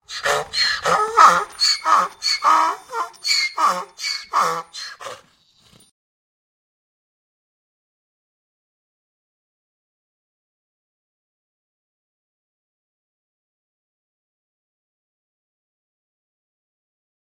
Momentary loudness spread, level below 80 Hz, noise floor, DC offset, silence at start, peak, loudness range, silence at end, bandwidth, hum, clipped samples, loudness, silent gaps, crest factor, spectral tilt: 16 LU; -64 dBFS; -57 dBFS; under 0.1%; 0.1 s; 0 dBFS; 12 LU; 12.05 s; 16.5 kHz; none; under 0.1%; -18 LUFS; none; 24 dB; 0 dB/octave